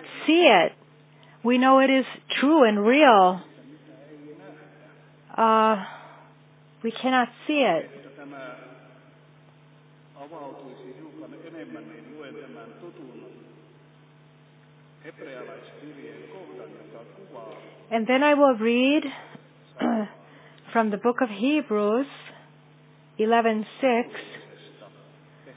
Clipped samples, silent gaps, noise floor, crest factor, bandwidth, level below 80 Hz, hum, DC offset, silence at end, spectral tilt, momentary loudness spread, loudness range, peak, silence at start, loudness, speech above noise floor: under 0.1%; none; -54 dBFS; 22 dB; 4 kHz; -84 dBFS; none; under 0.1%; 0.7 s; -8.5 dB/octave; 26 LU; 24 LU; -4 dBFS; 0 s; -22 LUFS; 31 dB